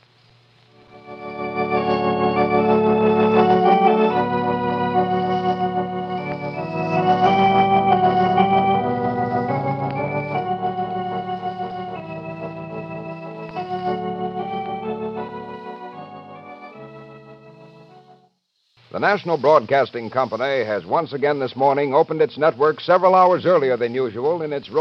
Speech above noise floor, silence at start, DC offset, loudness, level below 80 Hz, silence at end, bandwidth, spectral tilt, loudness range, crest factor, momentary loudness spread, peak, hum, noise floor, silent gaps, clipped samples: 49 dB; 0.95 s; under 0.1%; -19 LUFS; -56 dBFS; 0 s; 6.4 kHz; -8 dB/octave; 12 LU; 18 dB; 16 LU; -2 dBFS; none; -67 dBFS; none; under 0.1%